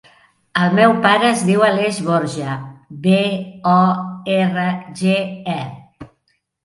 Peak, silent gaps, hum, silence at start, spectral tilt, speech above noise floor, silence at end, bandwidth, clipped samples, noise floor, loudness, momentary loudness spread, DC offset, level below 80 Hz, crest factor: 0 dBFS; none; none; 0.55 s; -6 dB/octave; 50 dB; 0.6 s; 11.5 kHz; under 0.1%; -67 dBFS; -17 LUFS; 12 LU; under 0.1%; -60 dBFS; 16 dB